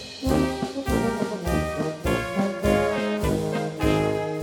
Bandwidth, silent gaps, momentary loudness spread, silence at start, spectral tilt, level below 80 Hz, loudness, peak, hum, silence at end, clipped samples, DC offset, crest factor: 19 kHz; none; 5 LU; 0 s; -6 dB/octave; -36 dBFS; -25 LUFS; -6 dBFS; none; 0 s; under 0.1%; under 0.1%; 18 dB